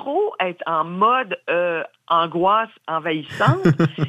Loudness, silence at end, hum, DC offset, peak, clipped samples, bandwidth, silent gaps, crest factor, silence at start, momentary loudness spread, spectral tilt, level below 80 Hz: -20 LUFS; 0 s; none; under 0.1%; -4 dBFS; under 0.1%; 10.5 kHz; none; 16 dB; 0 s; 7 LU; -7.5 dB/octave; -58 dBFS